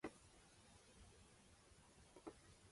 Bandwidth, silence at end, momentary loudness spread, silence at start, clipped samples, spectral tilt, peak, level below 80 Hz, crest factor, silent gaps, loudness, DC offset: 11.5 kHz; 0 s; 7 LU; 0 s; under 0.1%; -4 dB/octave; -36 dBFS; -74 dBFS; 26 dB; none; -65 LUFS; under 0.1%